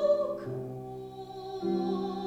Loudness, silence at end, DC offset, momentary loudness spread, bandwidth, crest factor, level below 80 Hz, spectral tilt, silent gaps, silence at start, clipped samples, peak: -34 LUFS; 0 s; under 0.1%; 13 LU; 8.8 kHz; 16 dB; -64 dBFS; -8 dB/octave; none; 0 s; under 0.1%; -16 dBFS